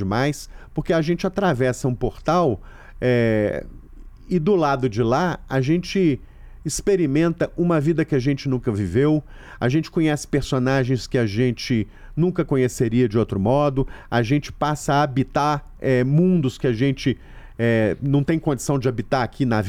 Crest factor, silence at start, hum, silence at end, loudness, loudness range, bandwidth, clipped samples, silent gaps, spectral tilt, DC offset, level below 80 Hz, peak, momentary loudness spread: 12 dB; 0 s; none; 0 s; -21 LUFS; 1 LU; 15.5 kHz; under 0.1%; none; -6.5 dB/octave; under 0.1%; -40 dBFS; -8 dBFS; 6 LU